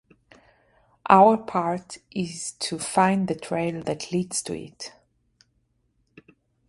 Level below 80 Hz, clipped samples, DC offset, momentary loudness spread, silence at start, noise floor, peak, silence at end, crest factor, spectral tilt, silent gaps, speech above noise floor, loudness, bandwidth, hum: -64 dBFS; under 0.1%; under 0.1%; 18 LU; 1.05 s; -70 dBFS; -2 dBFS; 1.8 s; 24 dB; -5 dB/octave; none; 46 dB; -23 LUFS; 11.5 kHz; none